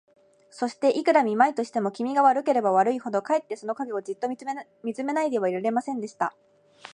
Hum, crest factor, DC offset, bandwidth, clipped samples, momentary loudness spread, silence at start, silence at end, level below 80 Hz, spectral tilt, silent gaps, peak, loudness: none; 20 dB; under 0.1%; 11 kHz; under 0.1%; 11 LU; 0.55 s; 0.05 s; -80 dBFS; -5.5 dB/octave; none; -6 dBFS; -25 LUFS